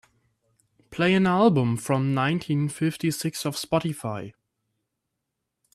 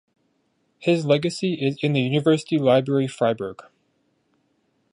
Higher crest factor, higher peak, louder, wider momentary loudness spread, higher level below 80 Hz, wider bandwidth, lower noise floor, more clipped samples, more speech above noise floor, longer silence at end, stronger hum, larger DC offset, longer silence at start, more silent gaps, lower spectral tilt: about the same, 18 dB vs 18 dB; about the same, -8 dBFS vs -6 dBFS; about the same, -24 LUFS vs -22 LUFS; first, 13 LU vs 6 LU; about the same, -62 dBFS vs -66 dBFS; first, 13.5 kHz vs 11 kHz; first, -82 dBFS vs -69 dBFS; neither; first, 58 dB vs 48 dB; first, 1.45 s vs 1.3 s; neither; neither; about the same, 0.9 s vs 0.8 s; neither; about the same, -6 dB/octave vs -6.5 dB/octave